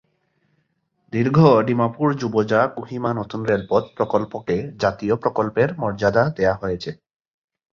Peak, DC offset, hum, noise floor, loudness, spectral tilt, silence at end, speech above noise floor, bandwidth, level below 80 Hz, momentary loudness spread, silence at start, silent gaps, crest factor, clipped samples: -2 dBFS; under 0.1%; none; -69 dBFS; -20 LUFS; -8 dB/octave; 0.8 s; 49 dB; 7.2 kHz; -50 dBFS; 10 LU; 1.15 s; none; 20 dB; under 0.1%